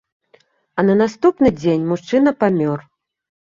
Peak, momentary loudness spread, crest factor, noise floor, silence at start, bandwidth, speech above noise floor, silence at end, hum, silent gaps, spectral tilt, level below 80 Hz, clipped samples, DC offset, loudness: -2 dBFS; 7 LU; 16 dB; -56 dBFS; 0.75 s; 7.6 kHz; 40 dB; 0.6 s; none; none; -7.5 dB/octave; -52 dBFS; under 0.1%; under 0.1%; -17 LUFS